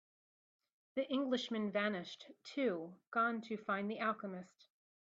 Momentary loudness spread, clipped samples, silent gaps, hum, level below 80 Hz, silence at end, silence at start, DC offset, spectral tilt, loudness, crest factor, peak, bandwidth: 11 LU; under 0.1%; 3.07-3.12 s; none; -88 dBFS; 0.6 s; 0.95 s; under 0.1%; -5.5 dB/octave; -39 LUFS; 18 dB; -22 dBFS; 7.8 kHz